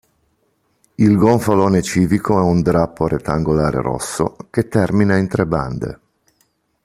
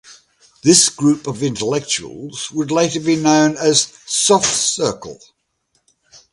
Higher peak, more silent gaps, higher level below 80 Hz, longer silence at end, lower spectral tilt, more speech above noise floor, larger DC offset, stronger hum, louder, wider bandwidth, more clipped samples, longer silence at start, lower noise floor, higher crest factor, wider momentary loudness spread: about the same, -2 dBFS vs 0 dBFS; neither; first, -40 dBFS vs -56 dBFS; second, 0.9 s vs 1.2 s; first, -7 dB/octave vs -3 dB/octave; about the same, 48 dB vs 50 dB; neither; neither; about the same, -17 LUFS vs -15 LUFS; first, 15 kHz vs 11.5 kHz; neither; first, 1 s vs 0.1 s; about the same, -64 dBFS vs -66 dBFS; about the same, 16 dB vs 18 dB; second, 9 LU vs 12 LU